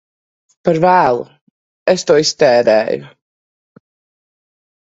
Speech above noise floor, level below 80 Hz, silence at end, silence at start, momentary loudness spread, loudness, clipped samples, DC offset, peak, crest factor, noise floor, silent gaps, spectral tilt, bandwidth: over 78 dB; -56 dBFS; 1.75 s; 0.65 s; 10 LU; -13 LUFS; under 0.1%; under 0.1%; 0 dBFS; 16 dB; under -90 dBFS; 1.41-1.86 s; -4.5 dB/octave; 8 kHz